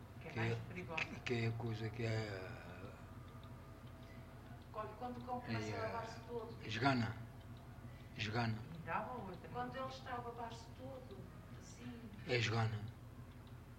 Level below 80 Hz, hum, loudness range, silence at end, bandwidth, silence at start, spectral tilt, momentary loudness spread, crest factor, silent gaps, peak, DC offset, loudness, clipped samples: -64 dBFS; none; 6 LU; 0 s; 16 kHz; 0 s; -6 dB/octave; 17 LU; 22 dB; none; -22 dBFS; under 0.1%; -44 LUFS; under 0.1%